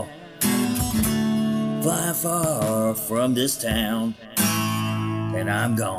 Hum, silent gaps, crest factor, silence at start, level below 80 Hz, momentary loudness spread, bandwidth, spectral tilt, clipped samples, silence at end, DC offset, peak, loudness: none; none; 18 dB; 0 s; -44 dBFS; 4 LU; 16.5 kHz; -4.5 dB/octave; under 0.1%; 0 s; under 0.1%; -4 dBFS; -23 LUFS